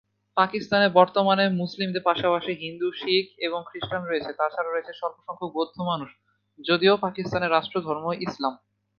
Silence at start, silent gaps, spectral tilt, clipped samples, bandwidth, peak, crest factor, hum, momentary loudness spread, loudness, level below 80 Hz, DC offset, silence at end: 0.35 s; none; -6.5 dB/octave; under 0.1%; 6.8 kHz; -2 dBFS; 22 dB; none; 12 LU; -25 LUFS; -64 dBFS; under 0.1%; 0.4 s